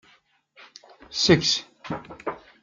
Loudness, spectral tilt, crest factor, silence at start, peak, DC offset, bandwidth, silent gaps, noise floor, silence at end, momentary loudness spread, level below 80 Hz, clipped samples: -24 LUFS; -4 dB/octave; 24 dB; 1.1 s; -2 dBFS; under 0.1%; 7.6 kHz; none; -61 dBFS; 0.25 s; 17 LU; -56 dBFS; under 0.1%